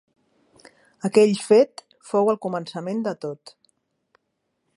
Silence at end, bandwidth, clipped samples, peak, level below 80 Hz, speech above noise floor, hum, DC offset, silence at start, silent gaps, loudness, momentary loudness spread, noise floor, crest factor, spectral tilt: 1.4 s; 11.5 kHz; under 0.1%; -2 dBFS; -76 dBFS; 55 dB; none; under 0.1%; 1.05 s; none; -22 LUFS; 16 LU; -76 dBFS; 20 dB; -6 dB/octave